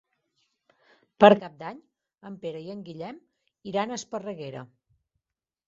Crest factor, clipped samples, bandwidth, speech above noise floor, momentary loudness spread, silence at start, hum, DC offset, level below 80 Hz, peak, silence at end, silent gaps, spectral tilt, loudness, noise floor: 26 dB; under 0.1%; 7.8 kHz; 63 dB; 23 LU; 1.2 s; none; under 0.1%; -70 dBFS; -2 dBFS; 1 s; none; -4 dB/octave; -24 LUFS; -88 dBFS